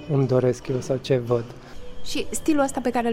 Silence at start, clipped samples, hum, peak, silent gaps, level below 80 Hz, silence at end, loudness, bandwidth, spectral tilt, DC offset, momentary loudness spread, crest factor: 0 s; under 0.1%; none; -8 dBFS; none; -46 dBFS; 0 s; -24 LUFS; 16 kHz; -6 dB/octave; under 0.1%; 18 LU; 14 dB